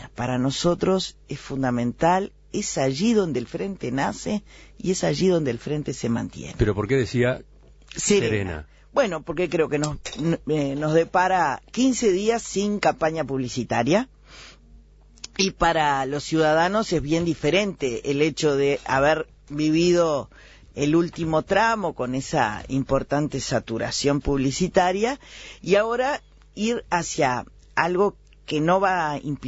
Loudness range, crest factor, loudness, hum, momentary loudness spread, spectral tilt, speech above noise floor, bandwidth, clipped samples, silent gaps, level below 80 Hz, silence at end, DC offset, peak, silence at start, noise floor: 3 LU; 20 dB; -23 LUFS; none; 9 LU; -5 dB/octave; 27 dB; 8 kHz; under 0.1%; none; -44 dBFS; 0 s; under 0.1%; -4 dBFS; 0 s; -50 dBFS